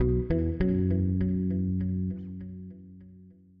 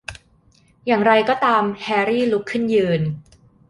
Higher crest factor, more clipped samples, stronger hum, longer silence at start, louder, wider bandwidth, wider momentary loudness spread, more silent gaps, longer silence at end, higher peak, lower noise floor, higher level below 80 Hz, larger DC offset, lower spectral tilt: about the same, 14 dB vs 18 dB; neither; neither; about the same, 0 s vs 0.1 s; second, -28 LUFS vs -18 LUFS; second, 4.9 kHz vs 11.5 kHz; first, 18 LU vs 12 LU; neither; second, 0.3 s vs 0.5 s; second, -14 dBFS vs -2 dBFS; about the same, -53 dBFS vs -56 dBFS; first, -40 dBFS vs -54 dBFS; neither; first, -11 dB/octave vs -6.5 dB/octave